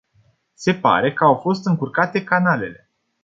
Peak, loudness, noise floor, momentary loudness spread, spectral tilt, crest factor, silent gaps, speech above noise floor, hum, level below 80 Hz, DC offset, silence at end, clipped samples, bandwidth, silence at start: -2 dBFS; -18 LUFS; -60 dBFS; 7 LU; -6.5 dB/octave; 18 dB; none; 42 dB; none; -60 dBFS; under 0.1%; 0.5 s; under 0.1%; 7.8 kHz; 0.6 s